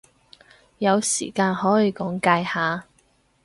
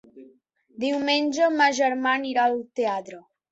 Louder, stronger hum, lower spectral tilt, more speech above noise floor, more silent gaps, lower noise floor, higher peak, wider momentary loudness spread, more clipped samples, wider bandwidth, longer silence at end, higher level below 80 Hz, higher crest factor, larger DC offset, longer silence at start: about the same, -22 LUFS vs -23 LUFS; neither; first, -4 dB/octave vs -2.5 dB/octave; first, 41 dB vs 36 dB; neither; about the same, -62 dBFS vs -59 dBFS; about the same, -4 dBFS vs -6 dBFS; second, 5 LU vs 9 LU; neither; first, 11.5 kHz vs 8.2 kHz; first, 0.6 s vs 0.3 s; first, -62 dBFS vs -72 dBFS; about the same, 20 dB vs 18 dB; neither; first, 0.8 s vs 0.15 s